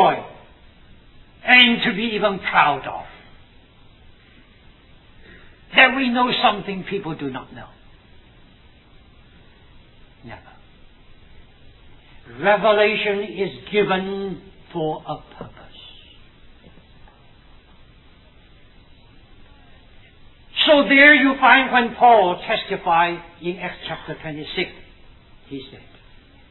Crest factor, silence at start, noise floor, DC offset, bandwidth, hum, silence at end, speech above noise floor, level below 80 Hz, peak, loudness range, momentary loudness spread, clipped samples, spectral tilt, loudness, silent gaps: 22 dB; 0 s; -50 dBFS; under 0.1%; 4.3 kHz; none; 0.75 s; 31 dB; -50 dBFS; 0 dBFS; 18 LU; 23 LU; under 0.1%; -7 dB/octave; -17 LUFS; none